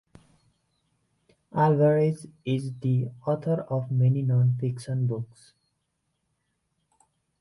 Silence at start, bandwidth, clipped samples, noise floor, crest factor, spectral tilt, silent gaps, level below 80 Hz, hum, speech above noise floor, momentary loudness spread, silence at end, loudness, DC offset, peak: 1.55 s; 11 kHz; under 0.1%; -77 dBFS; 18 dB; -9 dB/octave; none; -66 dBFS; none; 52 dB; 9 LU; 2.15 s; -26 LUFS; under 0.1%; -10 dBFS